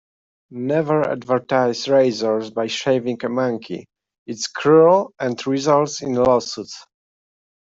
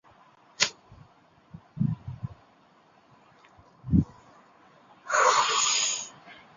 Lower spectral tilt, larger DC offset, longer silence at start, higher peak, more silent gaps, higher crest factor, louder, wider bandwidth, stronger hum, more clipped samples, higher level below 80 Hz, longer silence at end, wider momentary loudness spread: first, -5 dB/octave vs -3 dB/octave; neither; about the same, 0.5 s vs 0.6 s; about the same, -2 dBFS vs -2 dBFS; first, 4.18-4.26 s vs none; second, 16 dB vs 28 dB; first, -19 LUFS vs -25 LUFS; about the same, 7.8 kHz vs 7.6 kHz; neither; neither; second, -62 dBFS vs -48 dBFS; first, 0.8 s vs 0.25 s; second, 15 LU vs 20 LU